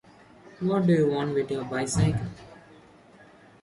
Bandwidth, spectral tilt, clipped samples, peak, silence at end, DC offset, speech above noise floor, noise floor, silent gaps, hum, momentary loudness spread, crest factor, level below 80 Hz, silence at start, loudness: 11.5 kHz; -6.5 dB/octave; under 0.1%; -12 dBFS; 1.05 s; under 0.1%; 28 dB; -53 dBFS; none; none; 11 LU; 16 dB; -52 dBFS; 0.45 s; -26 LUFS